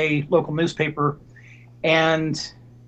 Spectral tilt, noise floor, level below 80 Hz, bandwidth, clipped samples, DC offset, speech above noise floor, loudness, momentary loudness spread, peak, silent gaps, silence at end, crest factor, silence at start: -5.5 dB/octave; -46 dBFS; -56 dBFS; 8.8 kHz; under 0.1%; under 0.1%; 25 dB; -22 LUFS; 11 LU; -4 dBFS; none; 0.35 s; 18 dB; 0 s